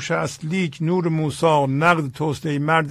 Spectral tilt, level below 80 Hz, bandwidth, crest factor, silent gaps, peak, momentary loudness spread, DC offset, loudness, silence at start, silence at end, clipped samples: -6 dB/octave; -54 dBFS; 13.5 kHz; 18 dB; none; -2 dBFS; 7 LU; under 0.1%; -21 LUFS; 0 s; 0 s; under 0.1%